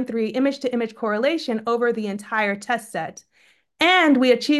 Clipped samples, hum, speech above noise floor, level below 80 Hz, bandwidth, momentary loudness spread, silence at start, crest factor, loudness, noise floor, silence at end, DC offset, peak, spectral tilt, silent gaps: under 0.1%; none; 38 dB; -72 dBFS; 12.5 kHz; 11 LU; 0 s; 18 dB; -21 LUFS; -59 dBFS; 0 s; under 0.1%; -4 dBFS; -4 dB/octave; none